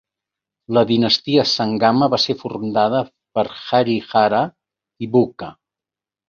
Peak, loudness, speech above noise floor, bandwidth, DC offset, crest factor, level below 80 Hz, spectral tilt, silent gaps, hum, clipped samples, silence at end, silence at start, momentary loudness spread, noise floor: 0 dBFS; -18 LUFS; 72 dB; 7.2 kHz; under 0.1%; 18 dB; -58 dBFS; -5.5 dB/octave; none; none; under 0.1%; 0.8 s; 0.7 s; 9 LU; -89 dBFS